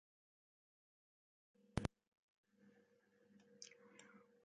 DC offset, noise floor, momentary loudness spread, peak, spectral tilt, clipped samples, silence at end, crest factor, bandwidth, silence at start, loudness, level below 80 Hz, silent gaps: under 0.1%; -76 dBFS; 18 LU; -24 dBFS; -6 dB/octave; under 0.1%; 0.25 s; 34 dB; 7.6 kHz; 1.75 s; -51 LUFS; -66 dBFS; 2.08-2.44 s